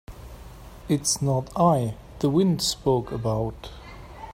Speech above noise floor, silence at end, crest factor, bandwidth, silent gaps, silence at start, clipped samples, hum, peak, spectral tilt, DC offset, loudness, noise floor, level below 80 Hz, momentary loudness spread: 19 dB; 0 s; 18 dB; 16 kHz; none; 0.1 s; under 0.1%; none; -6 dBFS; -5.5 dB/octave; under 0.1%; -24 LUFS; -43 dBFS; -46 dBFS; 22 LU